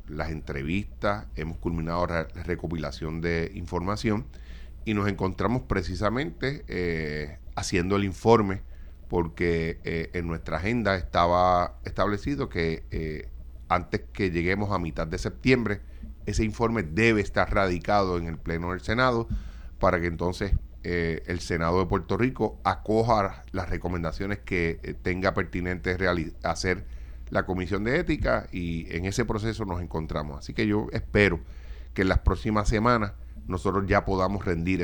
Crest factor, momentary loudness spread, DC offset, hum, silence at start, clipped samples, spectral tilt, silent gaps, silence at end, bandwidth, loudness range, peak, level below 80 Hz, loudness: 22 dB; 10 LU; under 0.1%; none; 0 s; under 0.1%; -6.5 dB/octave; none; 0 s; 19.5 kHz; 3 LU; -6 dBFS; -38 dBFS; -27 LUFS